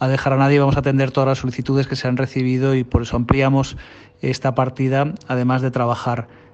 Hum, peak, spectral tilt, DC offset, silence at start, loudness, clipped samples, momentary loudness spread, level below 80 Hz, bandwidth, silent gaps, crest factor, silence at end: none; -2 dBFS; -7.5 dB/octave; under 0.1%; 0 s; -19 LUFS; under 0.1%; 7 LU; -38 dBFS; 8 kHz; none; 18 dB; 0.3 s